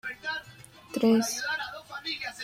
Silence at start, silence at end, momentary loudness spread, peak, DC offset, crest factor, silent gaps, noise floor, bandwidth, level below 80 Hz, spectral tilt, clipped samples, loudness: 0.05 s; 0 s; 14 LU; -12 dBFS; under 0.1%; 18 dB; none; -51 dBFS; 16 kHz; -68 dBFS; -3 dB/octave; under 0.1%; -29 LUFS